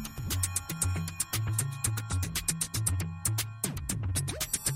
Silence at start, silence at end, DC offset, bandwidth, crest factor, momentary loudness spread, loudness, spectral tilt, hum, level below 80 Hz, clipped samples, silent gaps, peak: 0 s; 0 s; under 0.1%; 16.5 kHz; 22 dB; 3 LU; -31 LUFS; -3 dB/octave; none; -46 dBFS; under 0.1%; none; -10 dBFS